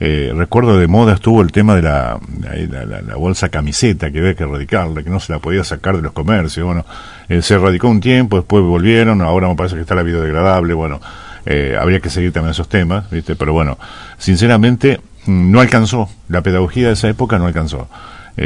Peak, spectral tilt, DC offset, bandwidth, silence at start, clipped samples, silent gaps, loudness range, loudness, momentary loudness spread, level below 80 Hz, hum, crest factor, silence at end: 0 dBFS; -6.5 dB/octave; under 0.1%; 11 kHz; 0 s; 0.3%; none; 5 LU; -13 LUFS; 12 LU; -30 dBFS; none; 12 dB; 0 s